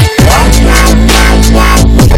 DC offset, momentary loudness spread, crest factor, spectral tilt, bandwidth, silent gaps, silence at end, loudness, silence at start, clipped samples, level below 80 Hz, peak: under 0.1%; 1 LU; 4 dB; -4.5 dB/octave; 16.5 kHz; none; 0 s; -6 LUFS; 0 s; 4%; -6 dBFS; 0 dBFS